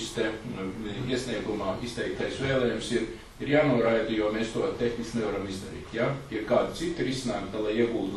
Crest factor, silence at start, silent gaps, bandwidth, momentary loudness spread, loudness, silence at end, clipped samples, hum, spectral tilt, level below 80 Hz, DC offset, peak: 20 dB; 0 s; none; 12 kHz; 10 LU; -29 LUFS; 0 s; under 0.1%; none; -5.5 dB/octave; -50 dBFS; under 0.1%; -10 dBFS